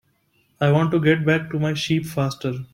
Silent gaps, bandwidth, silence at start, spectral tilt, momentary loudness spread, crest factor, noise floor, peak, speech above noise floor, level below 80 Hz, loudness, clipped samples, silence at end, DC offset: none; 15.5 kHz; 0.6 s; -6.5 dB/octave; 7 LU; 16 dB; -64 dBFS; -4 dBFS; 44 dB; -56 dBFS; -21 LUFS; under 0.1%; 0.1 s; under 0.1%